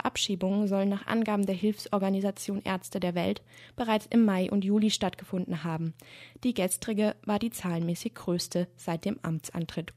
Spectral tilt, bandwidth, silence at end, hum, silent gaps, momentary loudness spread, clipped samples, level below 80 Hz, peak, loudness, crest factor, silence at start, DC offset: -5.5 dB/octave; 15 kHz; 0.05 s; none; none; 9 LU; under 0.1%; -62 dBFS; -12 dBFS; -30 LUFS; 16 dB; 0.05 s; under 0.1%